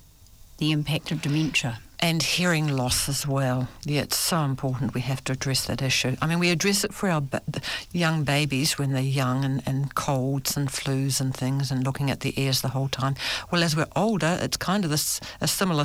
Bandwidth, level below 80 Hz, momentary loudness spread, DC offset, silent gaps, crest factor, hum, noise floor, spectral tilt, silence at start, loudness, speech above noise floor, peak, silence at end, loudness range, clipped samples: 19.5 kHz; -50 dBFS; 5 LU; under 0.1%; none; 14 dB; none; -50 dBFS; -4 dB/octave; 0.4 s; -25 LUFS; 25 dB; -12 dBFS; 0 s; 2 LU; under 0.1%